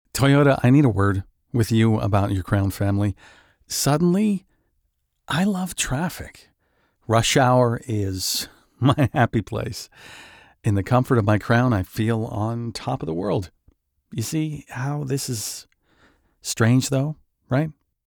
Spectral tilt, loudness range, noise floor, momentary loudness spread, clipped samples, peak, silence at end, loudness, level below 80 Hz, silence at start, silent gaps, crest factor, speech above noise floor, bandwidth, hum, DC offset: -5.5 dB/octave; 6 LU; -71 dBFS; 14 LU; under 0.1%; -4 dBFS; 0.35 s; -22 LUFS; -48 dBFS; 0.15 s; none; 18 dB; 50 dB; over 20 kHz; none; under 0.1%